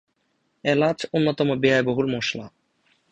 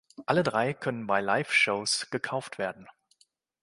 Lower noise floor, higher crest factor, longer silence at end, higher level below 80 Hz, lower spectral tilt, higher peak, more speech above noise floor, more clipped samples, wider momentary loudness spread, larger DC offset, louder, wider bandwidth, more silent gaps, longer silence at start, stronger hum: about the same, -70 dBFS vs -69 dBFS; about the same, 18 dB vs 22 dB; second, 0.65 s vs 0.8 s; first, -60 dBFS vs -70 dBFS; first, -6 dB/octave vs -3.5 dB/octave; about the same, -6 dBFS vs -8 dBFS; first, 49 dB vs 40 dB; neither; second, 8 LU vs 11 LU; neither; first, -22 LUFS vs -28 LUFS; second, 8.8 kHz vs 11.5 kHz; neither; first, 0.65 s vs 0.2 s; neither